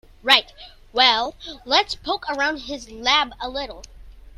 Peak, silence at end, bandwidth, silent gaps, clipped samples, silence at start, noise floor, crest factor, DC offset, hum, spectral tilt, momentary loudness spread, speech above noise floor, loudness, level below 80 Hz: 0 dBFS; 0.1 s; 16 kHz; none; under 0.1%; 0.25 s; -45 dBFS; 22 dB; under 0.1%; none; -1 dB/octave; 14 LU; 22 dB; -20 LUFS; -46 dBFS